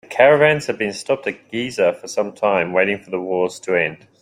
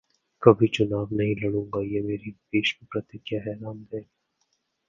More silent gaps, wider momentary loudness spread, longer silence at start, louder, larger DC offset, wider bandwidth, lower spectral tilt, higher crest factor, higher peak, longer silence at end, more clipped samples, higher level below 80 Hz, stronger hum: neither; second, 11 LU vs 17 LU; second, 0.1 s vs 0.4 s; first, -19 LUFS vs -25 LUFS; neither; first, 14 kHz vs 7.4 kHz; second, -4.5 dB/octave vs -7 dB/octave; second, 18 dB vs 26 dB; about the same, -2 dBFS vs 0 dBFS; second, 0.25 s vs 0.85 s; neither; about the same, -60 dBFS vs -56 dBFS; neither